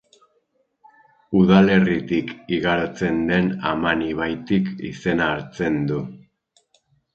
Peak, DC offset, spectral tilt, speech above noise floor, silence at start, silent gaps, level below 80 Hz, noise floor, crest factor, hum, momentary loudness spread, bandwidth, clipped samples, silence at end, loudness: 0 dBFS; under 0.1%; -7.5 dB/octave; 48 dB; 1.3 s; none; -48 dBFS; -67 dBFS; 22 dB; none; 11 LU; 7 kHz; under 0.1%; 0.95 s; -21 LUFS